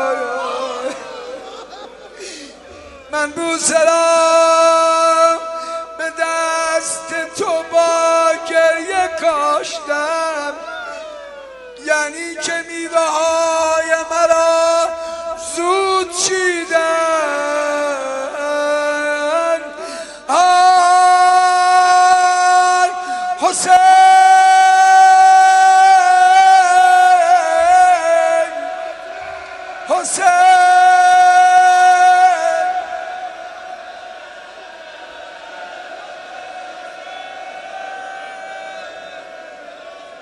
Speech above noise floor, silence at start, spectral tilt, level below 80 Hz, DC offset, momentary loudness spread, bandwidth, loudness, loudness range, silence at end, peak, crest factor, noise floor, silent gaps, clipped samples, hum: 24 dB; 0 s; -0.5 dB/octave; -58 dBFS; under 0.1%; 22 LU; 11.5 kHz; -12 LUFS; 21 LU; 0.05 s; 0 dBFS; 14 dB; -37 dBFS; none; under 0.1%; none